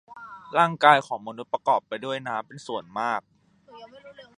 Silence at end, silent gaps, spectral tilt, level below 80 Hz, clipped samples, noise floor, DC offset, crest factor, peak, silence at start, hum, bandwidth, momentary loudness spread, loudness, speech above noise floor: 0.15 s; none; -4.5 dB/octave; -76 dBFS; under 0.1%; -51 dBFS; under 0.1%; 24 dB; -2 dBFS; 0.1 s; none; 11 kHz; 16 LU; -25 LUFS; 25 dB